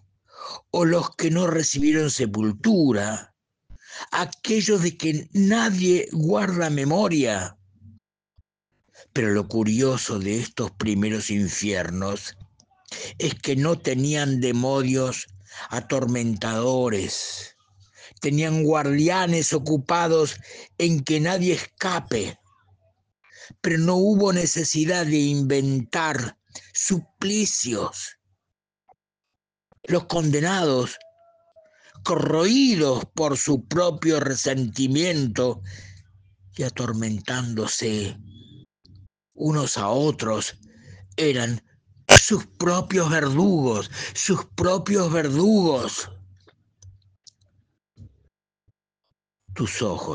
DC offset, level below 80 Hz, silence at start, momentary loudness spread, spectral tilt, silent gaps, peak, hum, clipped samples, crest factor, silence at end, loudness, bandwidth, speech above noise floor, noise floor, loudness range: under 0.1%; -52 dBFS; 0.35 s; 12 LU; -4.5 dB/octave; none; 0 dBFS; none; under 0.1%; 24 dB; 0 s; -22 LUFS; 10.5 kHz; 63 dB; -85 dBFS; 7 LU